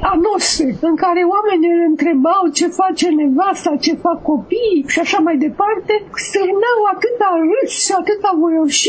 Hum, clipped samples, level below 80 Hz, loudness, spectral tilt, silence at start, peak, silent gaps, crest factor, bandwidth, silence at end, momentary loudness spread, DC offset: none; under 0.1%; -44 dBFS; -15 LUFS; -2.5 dB/octave; 0 s; 0 dBFS; none; 14 dB; 8 kHz; 0 s; 4 LU; under 0.1%